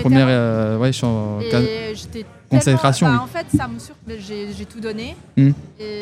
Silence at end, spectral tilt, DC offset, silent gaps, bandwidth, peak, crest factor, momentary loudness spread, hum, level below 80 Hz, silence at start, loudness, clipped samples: 0 s; -6.5 dB/octave; under 0.1%; none; 13.5 kHz; 0 dBFS; 18 dB; 16 LU; none; -44 dBFS; 0 s; -19 LUFS; under 0.1%